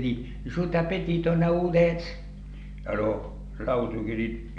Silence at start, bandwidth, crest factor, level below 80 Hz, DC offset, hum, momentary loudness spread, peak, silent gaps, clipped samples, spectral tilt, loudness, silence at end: 0 s; 7 kHz; 16 dB; -40 dBFS; under 0.1%; 50 Hz at -40 dBFS; 17 LU; -10 dBFS; none; under 0.1%; -8.5 dB/octave; -27 LUFS; 0 s